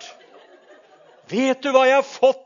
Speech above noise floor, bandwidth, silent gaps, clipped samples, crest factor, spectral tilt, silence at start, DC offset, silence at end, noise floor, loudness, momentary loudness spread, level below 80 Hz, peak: 33 dB; 7.4 kHz; none; under 0.1%; 20 dB; -3.5 dB/octave; 0 s; under 0.1%; 0.1 s; -51 dBFS; -18 LUFS; 7 LU; -82 dBFS; -2 dBFS